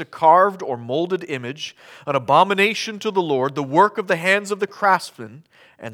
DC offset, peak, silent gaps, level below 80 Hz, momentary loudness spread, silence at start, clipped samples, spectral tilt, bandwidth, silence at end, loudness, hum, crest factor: under 0.1%; -2 dBFS; none; -76 dBFS; 17 LU; 0 s; under 0.1%; -4.5 dB/octave; 17 kHz; 0 s; -19 LUFS; none; 18 dB